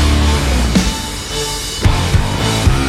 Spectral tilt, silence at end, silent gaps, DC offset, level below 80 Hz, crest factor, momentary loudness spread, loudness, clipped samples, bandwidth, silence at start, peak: -4.5 dB/octave; 0 s; none; under 0.1%; -18 dBFS; 14 dB; 5 LU; -15 LUFS; under 0.1%; 16 kHz; 0 s; 0 dBFS